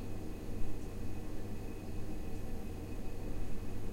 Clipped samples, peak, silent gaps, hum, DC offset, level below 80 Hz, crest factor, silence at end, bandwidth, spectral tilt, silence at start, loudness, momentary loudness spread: under 0.1%; -22 dBFS; none; none; under 0.1%; -44 dBFS; 14 dB; 0 s; 15.5 kHz; -7 dB/octave; 0 s; -45 LUFS; 1 LU